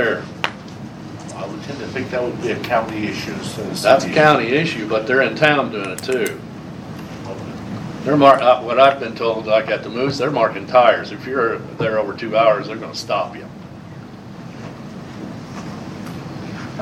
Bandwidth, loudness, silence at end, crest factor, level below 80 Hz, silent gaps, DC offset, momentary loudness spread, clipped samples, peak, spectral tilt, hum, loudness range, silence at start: 14.5 kHz; -18 LUFS; 0 s; 20 dB; -52 dBFS; none; under 0.1%; 20 LU; under 0.1%; 0 dBFS; -5 dB/octave; none; 9 LU; 0 s